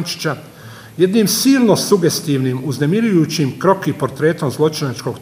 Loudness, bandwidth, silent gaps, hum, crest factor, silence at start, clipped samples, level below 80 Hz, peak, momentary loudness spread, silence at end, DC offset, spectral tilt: -16 LUFS; 16 kHz; none; none; 16 dB; 0 s; under 0.1%; -58 dBFS; 0 dBFS; 9 LU; 0 s; under 0.1%; -5 dB/octave